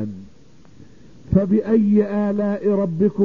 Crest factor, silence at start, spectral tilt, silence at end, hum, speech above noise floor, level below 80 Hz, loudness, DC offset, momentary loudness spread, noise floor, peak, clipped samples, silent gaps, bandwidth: 16 dB; 0 s; -10.5 dB/octave; 0 s; none; 32 dB; -44 dBFS; -19 LUFS; 0.6%; 5 LU; -50 dBFS; -4 dBFS; under 0.1%; none; 4.5 kHz